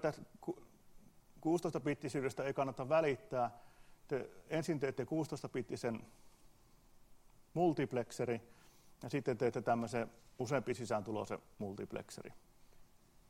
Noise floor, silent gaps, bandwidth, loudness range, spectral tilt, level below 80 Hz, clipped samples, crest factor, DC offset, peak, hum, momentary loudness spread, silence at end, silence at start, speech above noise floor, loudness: -65 dBFS; none; 16 kHz; 4 LU; -6.5 dB/octave; -70 dBFS; under 0.1%; 20 dB; under 0.1%; -20 dBFS; none; 13 LU; 0.45 s; 0 s; 26 dB; -40 LUFS